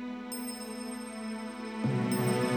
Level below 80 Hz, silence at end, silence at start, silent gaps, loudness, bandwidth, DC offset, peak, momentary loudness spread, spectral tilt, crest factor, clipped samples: -66 dBFS; 0 s; 0 s; none; -34 LUFS; 19 kHz; under 0.1%; -16 dBFS; 10 LU; -5.5 dB/octave; 16 dB; under 0.1%